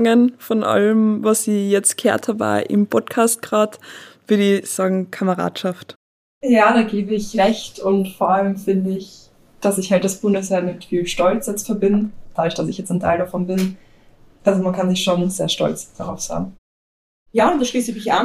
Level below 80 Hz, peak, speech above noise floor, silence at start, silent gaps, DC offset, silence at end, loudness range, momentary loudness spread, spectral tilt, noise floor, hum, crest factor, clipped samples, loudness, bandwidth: -48 dBFS; -2 dBFS; 30 dB; 0 s; 5.96-6.41 s, 16.58-17.26 s; under 0.1%; 0 s; 4 LU; 9 LU; -5 dB/octave; -48 dBFS; none; 16 dB; under 0.1%; -19 LUFS; 15.5 kHz